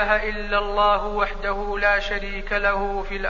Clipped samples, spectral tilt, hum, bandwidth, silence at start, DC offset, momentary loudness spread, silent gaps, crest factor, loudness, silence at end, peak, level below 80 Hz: under 0.1%; -4.5 dB/octave; none; 7.2 kHz; 0 s; 0.5%; 7 LU; none; 16 dB; -22 LUFS; 0 s; -6 dBFS; -32 dBFS